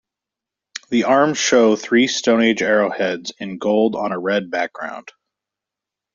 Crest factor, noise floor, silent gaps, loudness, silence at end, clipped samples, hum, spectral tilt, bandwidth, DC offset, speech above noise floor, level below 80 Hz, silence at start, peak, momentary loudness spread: 16 dB; -86 dBFS; none; -17 LUFS; 1.05 s; under 0.1%; none; -3.5 dB/octave; 7.6 kHz; under 0.1%; 68 dB; -64 dBFS; 0.75 s; -2 dBFS; 14 LU